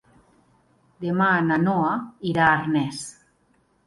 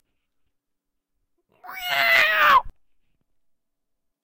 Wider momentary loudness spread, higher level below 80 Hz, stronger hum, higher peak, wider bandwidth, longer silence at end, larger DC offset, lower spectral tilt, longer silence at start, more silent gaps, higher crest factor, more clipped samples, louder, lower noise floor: second, 13 LU vs 16 LU; about the same, -58 dBFS vs -54 dBFS; neither; about the same, -6 dBFS vs -6 dBFS; second, 11.5 kHz vs 16 kHz; second, 0.75 s vs 1.55 s; neither; first, -6 dB/octave vs -0.5 dB/octave; second, 1 s vs 1.65 s; neither; about the same, 18 dB vs 20 dB; neither; second, -22 LUFS vs -17 LUFS; second, -64 dBFS vs -80 dBFS